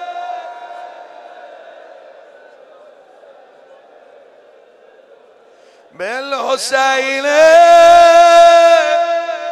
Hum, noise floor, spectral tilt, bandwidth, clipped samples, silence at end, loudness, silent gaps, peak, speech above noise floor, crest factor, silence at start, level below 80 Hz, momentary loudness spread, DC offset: none; -46 dBFS; -1 dB/octave; 12.5 kHz; under 0.1%; 0 s; -9 LUFS; none; 0 dBFS; 37 dB; 12 dB; 0 s; -56 dBFS; 22 LU; under 0.1%